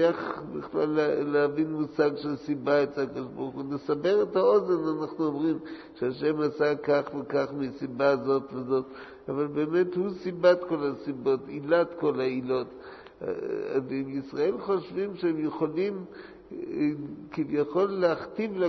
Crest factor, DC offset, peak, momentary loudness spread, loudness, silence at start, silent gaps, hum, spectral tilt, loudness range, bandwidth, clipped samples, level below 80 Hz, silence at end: 18 dB; under 0.1%; -8 dBFS; 11 LU; -28 LUFS; 0 s; none; none; -8 dB/octave; 4 LU; 6.2 kHz; under 0.1%; -66 dBFS; 0 s